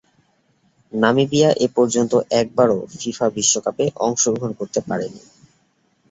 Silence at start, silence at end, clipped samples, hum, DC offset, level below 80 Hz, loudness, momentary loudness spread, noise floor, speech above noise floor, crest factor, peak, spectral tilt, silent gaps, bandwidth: 0.95 s; 0.95 s; under 0.1%; none; under 0.1%; -60 dBFS; -19 LUFS; 10 LU; -63 dBFS; 44 dB; 18 dB; -2 dBFS; -4 dB/octave; none; 8.2 kHz